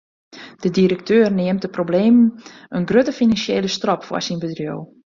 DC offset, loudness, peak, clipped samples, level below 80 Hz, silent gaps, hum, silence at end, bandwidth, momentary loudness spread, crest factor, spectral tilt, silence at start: under 0.1%; -18 LUFS; -2 dBFS; under 0.1%; -56 dBFS; none; none; 0.3 s; 7.4 kHz; 11 LU; 16 dB; -6 dB/octave; 0.35 s